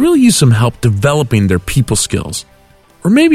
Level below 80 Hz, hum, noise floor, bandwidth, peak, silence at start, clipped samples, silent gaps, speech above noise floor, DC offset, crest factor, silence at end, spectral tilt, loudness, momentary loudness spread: -34 dBFS; none; -45 dBFS; 15.5 kHz; 0 dBFS; 0 s; under 0.1%; none; 34 dB; under 0.1%; 10 dB; 0 s; -5.5 dB/octave; -12 LUFS; 11 LU